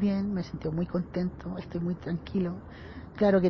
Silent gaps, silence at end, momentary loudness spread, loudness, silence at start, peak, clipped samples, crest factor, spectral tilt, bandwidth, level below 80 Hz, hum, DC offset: none; 0 s; 14 LU; -32 LUFS; 0 s; -12 dBFS; under 0.1%; 16 dB; -9 dB/octave; 6.2 kHz; -50 dBFS; none; under 0.1%